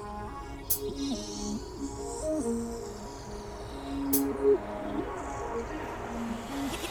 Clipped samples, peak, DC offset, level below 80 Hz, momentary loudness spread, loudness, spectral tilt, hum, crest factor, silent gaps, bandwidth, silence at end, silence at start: under 0.1%; -12 dBFS; under 0.1%; -46 dBFS; 14 LU; -33 LUFS; -4.5 dB/octave; none; 22 dB; none; over 20 kHz; 0 s; 0 s